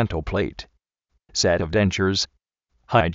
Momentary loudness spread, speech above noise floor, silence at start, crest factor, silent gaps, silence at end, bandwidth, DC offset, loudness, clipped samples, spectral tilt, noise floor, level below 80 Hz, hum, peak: 9 LU; 51 dB; 0 s; 20 dB; none; 0 s; 8 kHz; under 0.1%; -23 LUFS; under 0.1%; -4 dB/octave; -73 dBFS; -40 dBFS; none; -2 dBFS